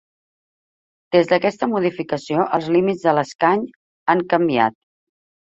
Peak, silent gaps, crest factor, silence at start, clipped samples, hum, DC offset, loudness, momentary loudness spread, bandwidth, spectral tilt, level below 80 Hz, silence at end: -2 dBFS; 3.35-3.39 s, 3.76-4.06 s; 18 dB; 1.1 s; under 0.1%; none; under 0.1%; -19 LUFS; 6 LU; 7.8 kHz; -6.5 dB/octave; -62 dBFS; 0.75 s